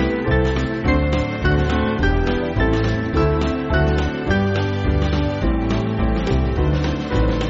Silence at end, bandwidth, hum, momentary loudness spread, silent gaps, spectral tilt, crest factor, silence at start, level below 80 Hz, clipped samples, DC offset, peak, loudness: 0 s; 7.6 kHz; none; 2 LU; none; -6 dB/octave; 14 dB; 0 s; -24 dBFS; under 0.1%; under 0.1%; -4 dBFS; -20 LUFS